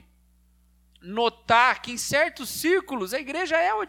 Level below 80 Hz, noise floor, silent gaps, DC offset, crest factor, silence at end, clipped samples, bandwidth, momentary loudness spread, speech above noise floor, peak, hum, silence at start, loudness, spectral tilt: -58 dBFS; -61 dBFS; none; under 0.1%; 20 dB; 0 s; under 0.1%; 19 kHz; 10 LU; 36 dB; -6 dBFS; 60 Hz at -55 dBFS; 1.05 s; -24 LUFS; -2.5 dB/octave